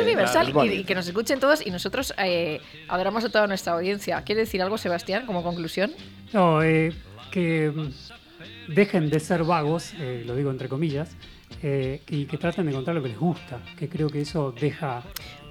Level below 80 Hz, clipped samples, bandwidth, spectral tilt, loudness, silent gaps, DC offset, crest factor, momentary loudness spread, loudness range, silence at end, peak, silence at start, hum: -52 dBFS; under 0.1%; 17 kHz; -6 dB/octave; -25 LUFS; none; under 0.1%; 20 dB; 13 LU; 4 LU; 0 s; -6 dBFS; 0 s; none